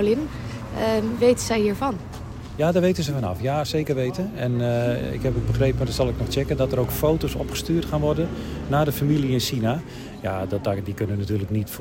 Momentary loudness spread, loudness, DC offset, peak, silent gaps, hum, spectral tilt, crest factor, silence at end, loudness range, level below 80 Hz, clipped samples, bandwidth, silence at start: 8 LU; -24 LUFS; under 0.1%; -6 dBFS; none; none; -6 dB/octave; 16 dB; 0 s; 1 LU; -38 dBFS; under 0.1%; 16.5 kHz; 0 s